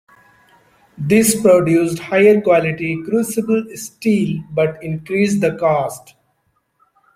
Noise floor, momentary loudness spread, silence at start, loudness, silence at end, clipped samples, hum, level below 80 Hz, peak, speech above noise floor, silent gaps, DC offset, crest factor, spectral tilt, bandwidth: -65 dBFS; 10 LU; 1 s; -16 LUFS; 1.2 s; under 0.1%; none; -54 dBFS; -2 dBFS; 50 dB; none; under 0.1%; 16 dB; -5.5 dB/octave; 16.5 kHz